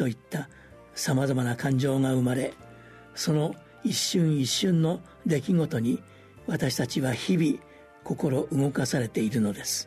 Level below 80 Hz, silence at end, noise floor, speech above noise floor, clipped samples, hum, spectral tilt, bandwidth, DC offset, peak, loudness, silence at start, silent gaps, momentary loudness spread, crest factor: -60 dBFS; 0 s; -49 dBFS; 23 dB; under 0.1%; none; -5.5 dB/octave; 13.5 kHz; under 0.1%; -14 dBFS; -27 LUFS; 0 s; none; 11 LU; 14 dB